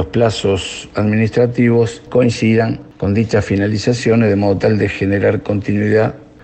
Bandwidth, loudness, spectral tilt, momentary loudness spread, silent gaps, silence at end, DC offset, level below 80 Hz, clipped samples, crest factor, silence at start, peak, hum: 8.8 kHz; -15 LUFS; -7 dB/octave; 5 LU; none; 0.2 s; under 0.1%; -42 dBFS; under 0.1%; 14 dB; 0 s; -2 dBFS; none